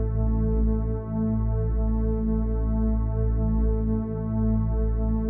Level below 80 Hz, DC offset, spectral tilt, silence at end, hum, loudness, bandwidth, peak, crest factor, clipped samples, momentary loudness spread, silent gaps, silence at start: -26 dBFS; under 0.1%; -14 dB/octave; 0 s; none; -26 LUFS; 2.1 kHz; -14 dBFS; 10 dB; under 0.1%; 2 LU; none; 0 s